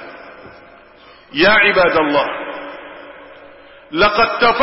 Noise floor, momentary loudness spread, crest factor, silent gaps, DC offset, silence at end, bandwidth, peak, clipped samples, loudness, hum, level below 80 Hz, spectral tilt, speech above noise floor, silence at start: -44 dBFS; 25 LU; 14 dB; none; under 0.1%; 0 s; 5.8 kHz; -2 dBFS; under 0.1%; -14 LUFS; none; -46 dBFS; -8 dB/octave; 31 dB; 0 s